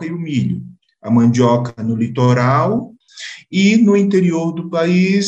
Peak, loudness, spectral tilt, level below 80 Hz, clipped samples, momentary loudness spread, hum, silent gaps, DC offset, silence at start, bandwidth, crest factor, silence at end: -2 dBFS; -15 LUFS; -7 dB/octave; -56 dBFS; under 0.1%; 16 LU; none; none; under 0.1%; 0 s; 8.2 kHz; 12 dB; 0 s